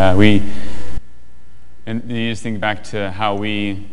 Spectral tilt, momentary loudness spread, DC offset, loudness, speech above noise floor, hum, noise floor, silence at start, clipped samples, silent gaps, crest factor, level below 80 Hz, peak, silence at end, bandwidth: -6.5 dB/octave; 19 LU; under 0.1%; -19 LUFS; 32 dB; none; -47 dBFS; 0 s; 0.1%; none; 16 dB; -36 dBFS; 0 dBFS; 0 s; 11.5 kHz